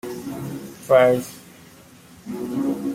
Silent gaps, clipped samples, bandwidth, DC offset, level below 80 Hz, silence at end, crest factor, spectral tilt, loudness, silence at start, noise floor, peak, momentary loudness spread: none; under 0.1%; 16.5 kHz; under 0.1%; -60 dBFS; 0 s; 20 dB; -6 dB/octave; -21 LUFS; 0.05 s; -47 dBFS; -4 dBFS; 21 LU